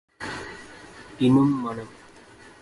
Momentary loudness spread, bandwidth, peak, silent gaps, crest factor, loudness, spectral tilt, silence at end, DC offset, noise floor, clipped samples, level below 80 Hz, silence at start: 24 LU; 11.5 kHz; -8 dBFS; none; 18 dB; -24 LUFS; -7 dB/octave; 0.1 s; under 0.1%; -49 dBFS; under 0.1%; -56 dBFS; 0.2 s